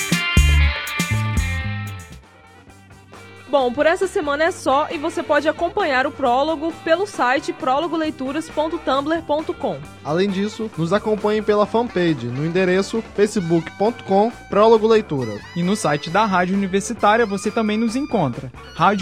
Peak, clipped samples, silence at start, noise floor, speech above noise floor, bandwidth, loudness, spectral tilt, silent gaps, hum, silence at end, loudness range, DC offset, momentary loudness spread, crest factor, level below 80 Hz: -2 dBFS; under 0.1%; 0 s; -46 dBFS; 27 dB; 17 kHz; -19 LUFS; -5.5 dB/octave; none; none; 0 s; 4 LU; 0.2%; 8 LU; 18 dB; -32 dBFS